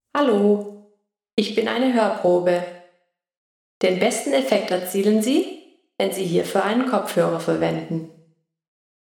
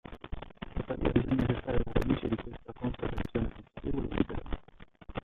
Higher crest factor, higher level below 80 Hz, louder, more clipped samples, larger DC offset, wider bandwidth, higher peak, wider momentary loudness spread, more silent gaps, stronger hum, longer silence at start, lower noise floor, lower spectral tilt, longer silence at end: about the same, 18 dB vs 20 dB; second, -70 dBFS vs -40 dBFS; first, -21 LUFS vs -34 LUFS; neither; neither; first, 19 kHz vs 6.6 kHz; first, -4 dBFS vs -12 dBFS; second, 9 LU vs 14 LU; first, 1.33-1.37 s, 3.37-3.81 s vs none; neither; about the same, 0.15 s vs 0.05 s; first, -65 dBFS vs -54 dBFS; second, -5 dB/octave vs -9 dB/octave; first, 1.1 s vs 0.05 s